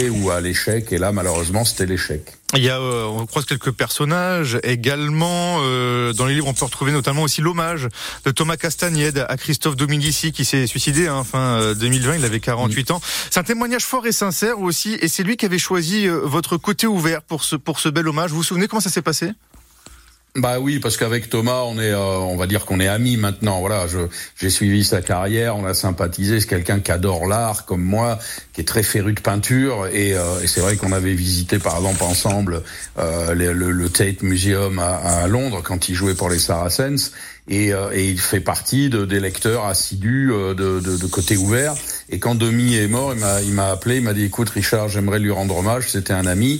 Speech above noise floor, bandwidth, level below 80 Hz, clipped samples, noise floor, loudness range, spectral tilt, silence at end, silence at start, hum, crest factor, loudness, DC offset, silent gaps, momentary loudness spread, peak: 27 dB; 16.5 kHz; -40 dBFS; under 0.1%; -46 dBFS; 1 LU; -4 dB/octave; 0 s; 0 s; none; 18 dB; -19 LUFS; under 0.1%; none; 4 LU; -2 dBFS